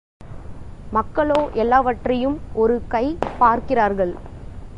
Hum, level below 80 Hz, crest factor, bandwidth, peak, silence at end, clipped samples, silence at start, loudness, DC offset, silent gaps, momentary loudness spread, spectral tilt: none; -38 dBFS; 18 dB; 10 kHz; -2 dBFS; 0 s; under 0.1%; 0.2 s; -20 LUFS; under 0.1%; none; 21 LU; -7.5 dB/octave